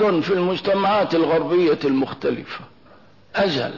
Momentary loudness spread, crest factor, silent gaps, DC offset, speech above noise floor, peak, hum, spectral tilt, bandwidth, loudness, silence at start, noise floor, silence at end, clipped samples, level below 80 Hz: 10 LU; 12 dB; none; 0.2%; 31 dB; -8 dBFS; none; -7 dB/octave; 6 kHz; -20 LUFS; 0 s; -51 dBFS; 0 s; under 0.1%; -58 dBFS